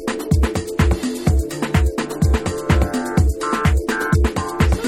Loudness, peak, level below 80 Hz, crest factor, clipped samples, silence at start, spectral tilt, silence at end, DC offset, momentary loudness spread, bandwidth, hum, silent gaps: -19 LUFS; -2 dBFS; -22 dBFS; 14 dB; under 0.1%; 0 s; -6 dB/octave; 0 s; under 0.1%; 2 LU; 16 kHz; none; none